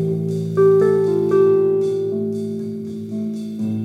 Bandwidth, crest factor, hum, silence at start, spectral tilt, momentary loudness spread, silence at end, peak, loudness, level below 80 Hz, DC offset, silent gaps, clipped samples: 9.4 kHz; 12 dB; none; 0 s; -9 dB/octave; 12 LU; 0 s; -6 dBFS; -19 LUFS; -70 dBFS; under 0.1%; none; under 0.1%